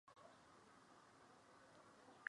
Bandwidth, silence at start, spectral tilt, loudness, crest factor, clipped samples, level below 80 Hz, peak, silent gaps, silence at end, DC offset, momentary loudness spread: 11 kHz; 0.05 s; -3 dB/octave; -67 LUFS; 34 dB; under 0.1%; under -90 dBFS; -28 dBFS; none; 0 s; under 0.1%; 1 LU